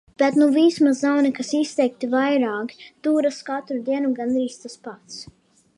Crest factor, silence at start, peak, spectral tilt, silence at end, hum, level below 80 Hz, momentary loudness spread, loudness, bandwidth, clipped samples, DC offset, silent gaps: 16 dB; 0.2 s; -6 dBFS; -4.5 dB/octave; 0.55 s; none; -68 dBFS; 20 LU; -21 LUFS; 11 kHz; under 0.1%; under 0.1%; none